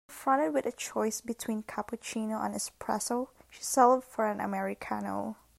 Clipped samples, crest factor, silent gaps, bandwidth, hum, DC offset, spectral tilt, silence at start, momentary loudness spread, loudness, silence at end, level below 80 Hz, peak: under 0.1%; 22 dB; none; 16 kHz; none; under 0.1%; -4 dB/octave; 0.1 s; 12 LU; -31 LUFS; 0.25 s; -68 dBFS; -10 dBFS